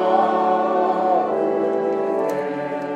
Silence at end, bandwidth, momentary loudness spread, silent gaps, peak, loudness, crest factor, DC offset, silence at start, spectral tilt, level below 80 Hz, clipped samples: 0 s; 13 kHz; 6 LU; none; -6 dBFS; -20 LUFS; 14 dB; under 0.1%; 0 s; -6.5 dB/octave; -74 dBFS; under 0.1%